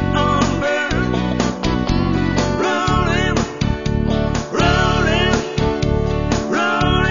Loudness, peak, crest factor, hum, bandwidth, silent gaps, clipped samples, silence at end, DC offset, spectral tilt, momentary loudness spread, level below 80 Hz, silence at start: -18 LUFS; 0 dBFS; 16 dB; none; 7.4 kHz; none; under 0.1%; 0 s; under 0.1%; -5.5 dB/octave; 4 LU; -26 dBFS; 0 s